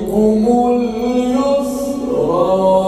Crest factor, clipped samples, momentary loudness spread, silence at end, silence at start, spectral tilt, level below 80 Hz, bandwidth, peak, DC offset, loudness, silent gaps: 12 dB; under 0.1%; 6 LU; 0 s; 0 s; -7 dB/octave; -40 dBFS; 13.5 kHz; -2 dBFS; under 0.1%; -15 LUFS; none